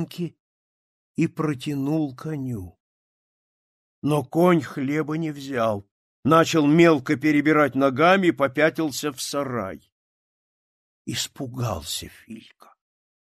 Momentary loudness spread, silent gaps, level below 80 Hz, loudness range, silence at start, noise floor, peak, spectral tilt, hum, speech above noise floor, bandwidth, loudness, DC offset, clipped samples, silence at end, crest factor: 16 LU; 0.40-1.15 s, 2.80-4.02 s, 5.91-6.23 s, 9.92-11.05 s; -58 dBFS; 12 LU; 0 s; under -90 dBFS; -4 dBFS; -5.5 dB/octave; none; over 68 dB; 14.5 kHz; -22 LUFS; under 0.1%; under 0.1%; 0.9 s; 20 dB